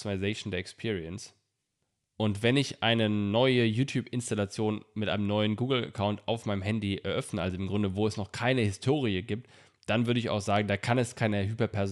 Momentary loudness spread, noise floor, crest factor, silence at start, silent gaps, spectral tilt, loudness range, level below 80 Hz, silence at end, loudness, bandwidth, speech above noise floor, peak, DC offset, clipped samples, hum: 8 LU; -81 dBFS; 18 dB; 0 s; none; -6 dB/octave; 3 LU; -64 dBFS; 0 s; -30 LUFS; 12 kHz; 52 dB; -12 dBFS; under 0.1%; under 0.1%; none